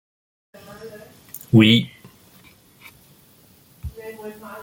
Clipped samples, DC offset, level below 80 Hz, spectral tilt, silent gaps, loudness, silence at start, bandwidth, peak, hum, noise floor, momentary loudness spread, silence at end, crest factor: under 0.1%; under 0.1%; -50 dBFS; -6 dB/octave; none; -16 LUFS; 0.85 s; 17 kHz; -2 dBFS; none; -53 dBFS; 27 LU; 0.05 s; 22 dB